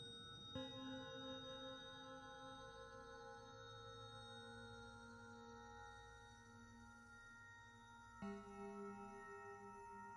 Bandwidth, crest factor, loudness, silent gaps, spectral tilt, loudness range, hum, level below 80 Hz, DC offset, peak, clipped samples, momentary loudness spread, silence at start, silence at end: 10.5 kHz; 20 dB; -56 LUFS; none; -4.5 dB/octave; 6 LU; none; -74 dBFS; under 0.1%; -38 dBFS; under 0.1%; 10 LU; 0 s; 0 s